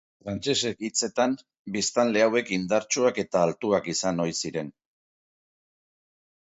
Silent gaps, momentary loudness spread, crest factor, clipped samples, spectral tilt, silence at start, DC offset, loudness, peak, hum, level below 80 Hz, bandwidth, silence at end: 1.59-1.65 s; 10 LU; 20 dB; under 0.1%; -3.5 dB/octave; 0.25 s; under 0.1%; -26 LUFS; -8 dBFS; none; -62 dBFS; 8.2 kHz; 1.8 s